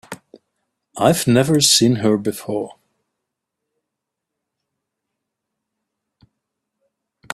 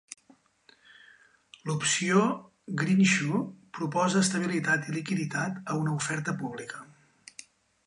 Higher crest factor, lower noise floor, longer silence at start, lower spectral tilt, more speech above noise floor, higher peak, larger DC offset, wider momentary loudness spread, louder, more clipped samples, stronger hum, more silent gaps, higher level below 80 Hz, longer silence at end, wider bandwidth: about the same, 22 dB vs 20 dB; first, -81 dBFS vs -63 dBFS; about the same, 0.1 s vs 0.1 s; about the same, -4 dB/octave vs -4.5 dB/octave; first, 65 dB vs 35 dB; first, -2 dBFS vs -10 dBFS; neither; first, 24 LU vs 21 LU; first, -16 LUFS vs -28 LUFS; neither; neither; neither; first, -58 dBFS vs -72 dBFS; first, 4.65 s vs 1 s; first, 15.5 kHz vs 11.5 kHz